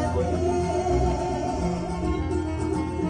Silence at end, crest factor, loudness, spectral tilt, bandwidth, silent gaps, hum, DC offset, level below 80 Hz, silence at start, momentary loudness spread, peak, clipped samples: 0 s; 14 dB; -26 LUFS; -7 dB/octave; 10.5 kHz; none; none; under 0.1%; -34 dBFS; 0 s; 4 LU; -12 dBFS; under 0.1%